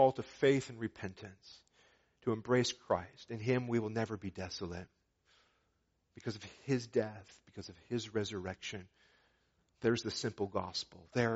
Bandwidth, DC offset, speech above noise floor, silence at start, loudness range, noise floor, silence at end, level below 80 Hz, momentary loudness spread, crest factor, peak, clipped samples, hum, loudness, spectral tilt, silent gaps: 8 kHz; under 0.1%; 42 dB; 0 s; 5 LU; -79 dBFS; 0 s; -70 dBFS; 18 LU; 22 dB; -16 dBFS; under 0.1%; none; -37 LUFS; -4.5 dB/octave; none